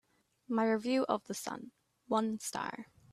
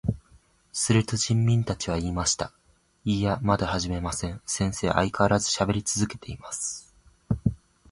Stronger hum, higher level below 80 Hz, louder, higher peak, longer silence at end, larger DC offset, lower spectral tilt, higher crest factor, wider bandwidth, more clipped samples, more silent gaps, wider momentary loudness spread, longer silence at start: neither; second, -78 dBFS vs -44 dBFS; second, -35 LUFS vs -26 LUFS; second, -16 dBFS vs -6 dBFS; about the same, 0.3 s vs 0.35 s; neither; about the same, -4 dB/octave vs -4.5 dB/octave; about the same, 20 dB vs 22 dB; first, 14.5 kHz vs 11.5 kHz; neither; neither; first, 14 LU vs 10 LU; first, 0.5 s vs 0.05 s